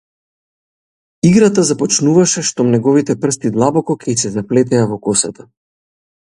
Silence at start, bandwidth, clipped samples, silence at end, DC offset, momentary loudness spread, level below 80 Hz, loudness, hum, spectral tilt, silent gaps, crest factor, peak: 1.25 s; 11.5 kHz; under 0.1%; 1 s; under 0.1%; 6 LU; -52 dBFS; -14 LUFS; none; -5 dB/octave; none; 14 dB; 0 dBFS